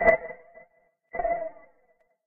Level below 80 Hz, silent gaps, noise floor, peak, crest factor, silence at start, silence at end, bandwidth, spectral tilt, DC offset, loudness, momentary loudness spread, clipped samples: -50 dBFS; none; -67 dBFS; -6 dBFS; 22 dB; 0 s; 0.75 s; 4.6 kHz; -4.5 dB/octave; under 0.1%; -29 LUFS; 17 LU; under 0.1%